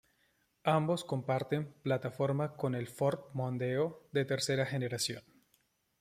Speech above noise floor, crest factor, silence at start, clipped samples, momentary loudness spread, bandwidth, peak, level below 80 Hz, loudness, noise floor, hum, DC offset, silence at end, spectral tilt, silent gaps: 41 dB; 20 dB; 0.65 s; under 0.1%; 5 LU; 15.5 kHz; -14 dBFS; -74 dBFS; -34 LUFS; -75 dBFS; none; under 0.1%; 0.8 s; -5.5 dB/octave; none